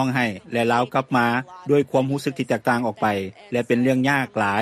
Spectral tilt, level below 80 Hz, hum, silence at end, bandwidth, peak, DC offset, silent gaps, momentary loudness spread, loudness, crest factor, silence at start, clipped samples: -6 dB/octave; -62 dBFS; none; 0 s; 14.5 kHz; -6 dBFS; under 0.1%; none; 6 LU; -22 LUFS; 14 dB; 0 s; under 0.1%